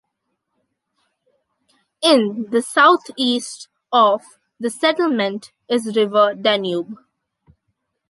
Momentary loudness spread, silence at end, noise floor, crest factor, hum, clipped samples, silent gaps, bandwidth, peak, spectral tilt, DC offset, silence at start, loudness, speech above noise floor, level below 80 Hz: 13 LU; 1.15 s; -75 dBFS; 18 dB; none; under 0.1%; none; 11.5 kHz; -2 dBFS; -3.5 dB/octave; under 0.1%; 2 s; -18 LUFS; 58 dB; -72 dBFS